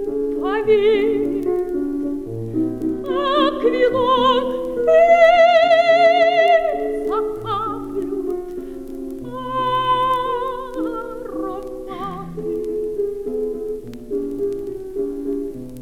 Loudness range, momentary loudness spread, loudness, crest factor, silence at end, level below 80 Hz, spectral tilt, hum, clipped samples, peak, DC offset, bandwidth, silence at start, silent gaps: 12 LU; 16 LU; -19 LUFS; 14 dB; 0 s; -44 dBFS; -5.5 dB/octave; none; under 0.1%; -4 dBFS; under 0.1%; 13.5 kHz; 0 s; none